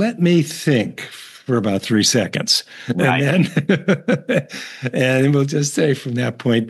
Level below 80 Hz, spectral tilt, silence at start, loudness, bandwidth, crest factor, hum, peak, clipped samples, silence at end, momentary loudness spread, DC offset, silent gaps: -68 dBFS; -5 dB/octave; 0 s; -18 LUFS; 12.5 kHz; 16 dB; none; -2 dBFS; under 0.1%; 0 s; 10 LU; under 0.1%; none